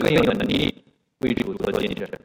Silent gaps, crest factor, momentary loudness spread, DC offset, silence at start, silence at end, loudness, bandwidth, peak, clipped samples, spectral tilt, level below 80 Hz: none; 18 dB; 8 LU; under 0.1%; 0 s; 0.15 s; -23 LUFS; 17 kHz; -4 dBFS; under 0.1%; -6 dB/octave; -46 dBFS